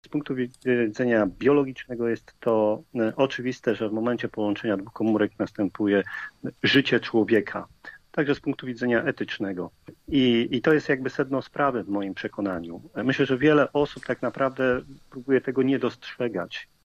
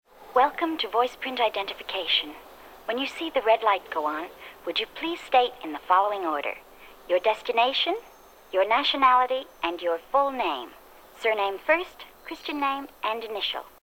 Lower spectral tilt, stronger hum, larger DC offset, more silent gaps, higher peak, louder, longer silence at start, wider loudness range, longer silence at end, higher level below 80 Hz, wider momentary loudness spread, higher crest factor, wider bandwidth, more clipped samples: first, -6.5 dB/octave vs -2.5 dB/octave; neither; neither; neither; about the same, -8 dBFS vs -8 dBFS; about the same, -25 LUFS vs -25 LUFS; second, 0.05 s vs 0.2 s; about the same, 2 LU vs 4 LU; about the same, 0.2 s vs 0.15 s; about the same, -58 dBFS vs -62 dBFS; about the same, 10 LU vs 12 LU; about the same, 18 dB vs 20 dB; second, 9.2 kHz vs 17.5 kHz; neither